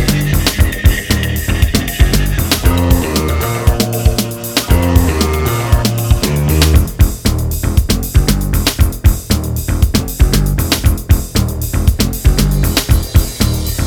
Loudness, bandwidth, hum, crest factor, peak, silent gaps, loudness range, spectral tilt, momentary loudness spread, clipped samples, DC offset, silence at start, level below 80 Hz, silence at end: -14 LUFS; 18.5 kHz; none; 12 dB; 0 dBFS; none; 1 LU; -5 dB/octave; 4 LU; 0.3%; under 0.1%; 0 s; -16 dBFS; 0 s